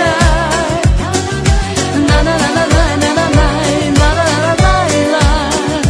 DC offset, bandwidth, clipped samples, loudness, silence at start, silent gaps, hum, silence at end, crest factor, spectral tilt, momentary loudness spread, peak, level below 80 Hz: under 0.1%; 11 kHz; under 0.1%; -12 LUFS; 0 s; none; none; 0 s; 12 dB; -5 dB/octave; 3 LU; 0 dBFS; -18 dBFS